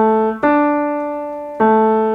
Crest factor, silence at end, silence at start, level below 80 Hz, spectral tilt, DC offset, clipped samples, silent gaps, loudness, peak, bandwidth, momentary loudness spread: 14 dB; 0 s; 0 s; -52 dBFS; -9 dB/octave; under 0.1%; under 0.1%; none; -16 LUFS; -2 dBFS; 4.8 kHz; 11 LU